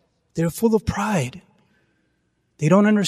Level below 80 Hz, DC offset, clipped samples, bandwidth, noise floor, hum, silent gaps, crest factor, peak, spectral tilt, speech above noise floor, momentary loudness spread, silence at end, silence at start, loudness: -46 dBFS; under 0.1%; under 0.1%; 15.5 kHz; -69 dBFS; none; none; 18 dB; -4 dBFS; -6.5 dB/octave; 50 dB; 11 LU; 0 s; 0.35 s; -21 LUFS